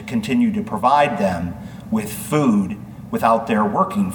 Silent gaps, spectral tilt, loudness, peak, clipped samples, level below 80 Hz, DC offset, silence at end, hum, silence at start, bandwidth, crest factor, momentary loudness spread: none; -6.5 dB/octave; -19 LUFS; -2 dBFS; under 0.1%; -48 dBFS; under 0.1%; 0 s; none; 0 s; 19 kHz; 16 dB; 11 LU